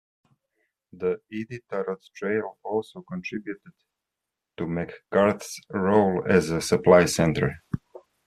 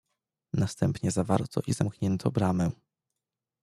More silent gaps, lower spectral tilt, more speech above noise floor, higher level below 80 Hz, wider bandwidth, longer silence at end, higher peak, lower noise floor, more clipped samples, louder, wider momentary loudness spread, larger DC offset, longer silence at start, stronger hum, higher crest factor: neither; second, -5.5 dB/octave vs -7 dB/octave; about the same, 61 dB vs 61 dB; about the same, -56 dBFS vs -58 dBFS; about the same, 14 kHz vs 13 kHz; second, 0.3 s vs 0.9 s; first, -4 dBFS vs -8 dBFS; about the same, -86 dBFS vs -89 dBFS; neither; first, -25 LUFS vs -29 LUFS; first, 17 LU vs 5 LU; neither; first, 0.95 s vs 0.55 s; neither; about the same, 22 dB vs 20 dB